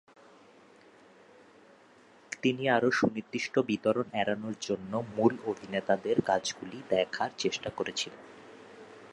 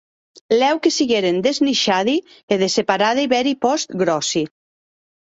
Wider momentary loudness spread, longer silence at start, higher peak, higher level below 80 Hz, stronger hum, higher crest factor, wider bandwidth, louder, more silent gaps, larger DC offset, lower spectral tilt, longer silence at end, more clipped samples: first, 18 LU vs 5 LU; first, 2.3 s vs 0.5 s; second, -10 dBFS vs -2 dBFS; second, -68 dBFS vs -62 dBFS; neither; about the same, 22 dB vs 18 dB; first, 11.5 kHz vs 8 kHz; second, -31 LUFS vs -18 LUFS; second, none vs 2.43-2.48 s; neither; about the same, -4.5 dB/octave vs -3.5 dB/octave; second, 0.05 s vs 0.9 s; neither